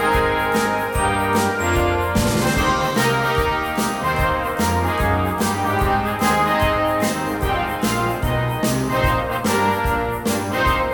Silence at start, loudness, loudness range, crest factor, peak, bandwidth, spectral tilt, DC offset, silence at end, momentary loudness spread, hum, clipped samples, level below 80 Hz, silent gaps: 0 s; -19 LUFS; 1 LU; 14 dB; -4 dBFS; over 20 kHz; -5 dB/octave; under 0.1%; 0 s; 3 LU; none; under 0.1%; -32 dBFS; none